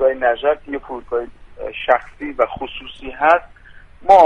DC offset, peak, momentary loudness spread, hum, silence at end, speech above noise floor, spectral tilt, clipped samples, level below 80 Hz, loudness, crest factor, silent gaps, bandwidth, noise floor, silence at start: under 0.1%; 0 dBFS; 15 LU; none; 0 s; 21 dB; -5 dB/octave; under 0.1%; -44 dBFS; -19 LUFS; 18 dB; none; 9 kHz; -40 dBFS; 0 s